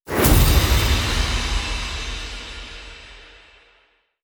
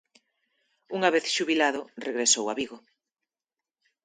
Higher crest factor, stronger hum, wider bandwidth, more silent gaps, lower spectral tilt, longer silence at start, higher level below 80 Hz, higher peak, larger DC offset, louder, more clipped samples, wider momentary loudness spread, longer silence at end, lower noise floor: about the same, 18 dB vs 22 dB; neither; first, over 20 kHz vs 9.8 kHz; neither; first, -4 dB/octave vs -1.5 dB/octave; second, 0.05 s vs 0.9 s; first, -24 dBFS vs -76 dBFS; first, -2 dBFS vs -8 dBFS; neither; first, -20 LUFS vs -26 LUFS; neither; first, 22 LU vs 12 LU; second, 1 s vs 1.25 s; second, -61 dBFS vs under -90 dBFS